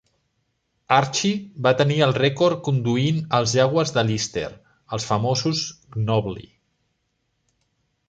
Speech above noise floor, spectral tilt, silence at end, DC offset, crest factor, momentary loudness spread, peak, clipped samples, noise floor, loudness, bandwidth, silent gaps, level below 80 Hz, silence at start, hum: 52 dB; -5 dB/octave; 1.7 s; under 0.1%; 20 dB; 11 LU; -2 dBFS; under 0.1%; -72 dBFS; -21 LUFS; 9.2 kHz; none; -56 dBFS; 0.9 s; none